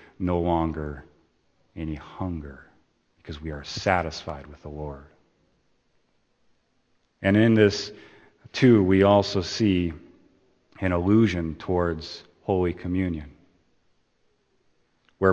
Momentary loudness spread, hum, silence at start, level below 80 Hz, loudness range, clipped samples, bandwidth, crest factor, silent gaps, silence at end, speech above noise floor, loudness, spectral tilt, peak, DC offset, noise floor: 19 LU; none; 0.2 s; -48 dBFS; 11 LU; under 0.1%; 8.4 kHz; 22 dB; none; 0 s; 45 dB; -24 LUFS; -6.5 dB/octave; -4 dBFS; under 0.1%; -69 dBFS